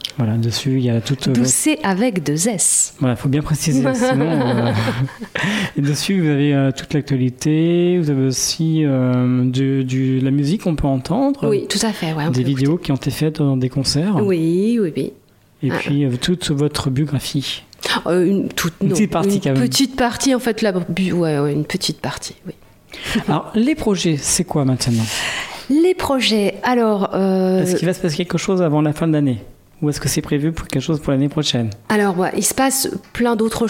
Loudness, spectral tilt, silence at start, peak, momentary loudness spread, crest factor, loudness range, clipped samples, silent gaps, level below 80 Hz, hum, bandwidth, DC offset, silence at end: -18 LUFS; -5 dB/octave; 0.05 s; -2 dBFS; 6 LU; 16 dB; 3 LU; under 0.1%; none; -44 dBFS; none; 16.5 kHz; under 0.1%; 0 s